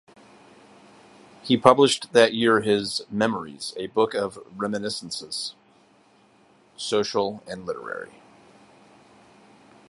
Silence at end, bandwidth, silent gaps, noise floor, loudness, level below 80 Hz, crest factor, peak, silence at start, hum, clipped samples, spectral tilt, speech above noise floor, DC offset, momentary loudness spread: 1.85 s; 11.5 kHz; none; -58 dBFS; -23 LUFS; -66 dBFS; 26 dB; 0 dBFS; 1.45 s; none; under 0.1%; -4 dB/octave; 35 dB; under 0.1%; 16 LU